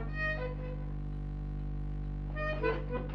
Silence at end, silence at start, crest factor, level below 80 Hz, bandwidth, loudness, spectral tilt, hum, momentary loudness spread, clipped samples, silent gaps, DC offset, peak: 0 s; 0 s; 16 dB; -38 dBFS; 6 kHz; -37 LUFS; -8.5 dB/octave; 50 Hz at -40 dBFS; 7 LU; under 0.1%; none; under 0.1%; -18 dBFS